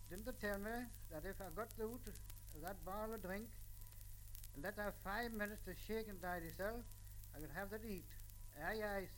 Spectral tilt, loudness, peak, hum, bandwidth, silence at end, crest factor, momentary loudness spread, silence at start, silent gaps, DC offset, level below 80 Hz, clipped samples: -5 dB/octave; -49 LUFS; -28 dBFS; 50 Hz at -60 dBFS; 17 kHz; 0 s; 20 dB; 12 LU; 0 s; none; under 0.1%; -56 dBFS; under 0.1%